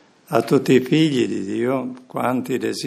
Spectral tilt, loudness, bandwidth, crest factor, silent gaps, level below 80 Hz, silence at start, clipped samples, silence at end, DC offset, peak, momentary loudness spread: -6 dB/octave; -20 LUFS; 15.5 kHz; 20 dB; none; -68 dBFS; 0.3 s; under 0.1%; 0 s; under 0.1%; 0 dBFS; 8 LU